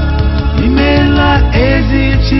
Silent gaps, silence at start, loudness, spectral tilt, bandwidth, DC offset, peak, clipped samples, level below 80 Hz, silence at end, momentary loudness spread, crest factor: none; 0 s; -10 LUFS; -8 dB/octave; 6 kHz; under 0.1%; 0 dBFS; under 0.1%; -14 dBFS; 0 s; 4 LU; 10 dB